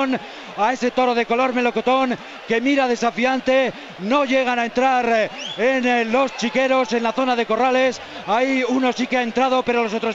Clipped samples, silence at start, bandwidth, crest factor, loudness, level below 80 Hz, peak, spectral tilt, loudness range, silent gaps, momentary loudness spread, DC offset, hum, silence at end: under 0.1%; 0 s; 8 kHz; 12 dB; -19 LUFS; -58 dBFS; -6 dBFS; -4 dB/octave; 1 LU; none; 5 LU; under 0.1%; none; 0 s